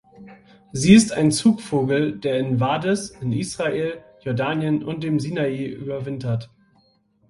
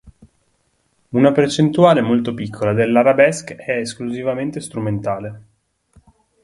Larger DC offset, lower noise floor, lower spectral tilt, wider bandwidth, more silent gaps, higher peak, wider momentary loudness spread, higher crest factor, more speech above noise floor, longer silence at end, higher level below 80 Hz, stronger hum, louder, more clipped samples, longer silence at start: neither; about the same, -61 dBFS vs -64 dBFS; about the same, -5.5 dB/octave vs -6 dB/octave; about the same, 11.5 kHz vs 11.5 kHz; neither; about the same, 0 dBFS vs 0 dBFS; about the same, 14 LU vs 12 LU; about the same, 22 dB vs 18 dB; second, 41 dB vs 48 dB; second, 0.85 s vs 1.05 s; about the same, -54 dBFS vs -54 dBFS; neither; second, -21 LUFS vs -17 LUFS; neither; first, 0.2 s vs 0.05 s